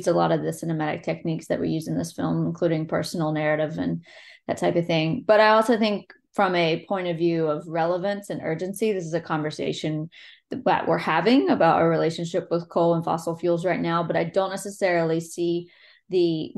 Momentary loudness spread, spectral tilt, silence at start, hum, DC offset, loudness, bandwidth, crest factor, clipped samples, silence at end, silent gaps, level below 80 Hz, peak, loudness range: 9 LU; -6 dB/octave; 0 s; none; under 0.1%; -24 LUFS; 12.5 kHz; 18 dB; under 0.1%; 0.1 s; none; -66 dBFS; -6 dBFS; 4 LU